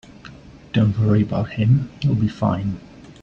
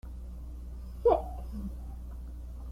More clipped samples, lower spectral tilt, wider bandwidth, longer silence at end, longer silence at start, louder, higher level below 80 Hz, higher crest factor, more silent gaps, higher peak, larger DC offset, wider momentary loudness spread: neither; about the same, -9 dB/octave vs -8.5 dB/octave; second, 7 kHz vs 14.5 kHz; about the same, 0.1 s vs 0 s; first, 0.25 s vs 0.05 s; first, -20 LUFS vs -35 LUFS; second, -46 dBFS vs -40 dBFS; second, 16 dB vs 22 dB; neither; first, -4 dBFS vs -12 dBFS; neither; second, 7 LU vs 17 LU